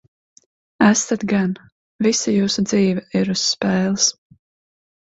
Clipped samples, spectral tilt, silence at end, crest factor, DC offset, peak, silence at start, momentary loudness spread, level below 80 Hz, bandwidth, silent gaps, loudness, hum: under 0.1%; -4 dB/octave; 0.95 s; 20 dB; under 0.1%; 0 dBFS; 0.8 s; 5 LU; -56 dBFS; 8 kHz; 1.72-1.99 s; -18 LUFS; none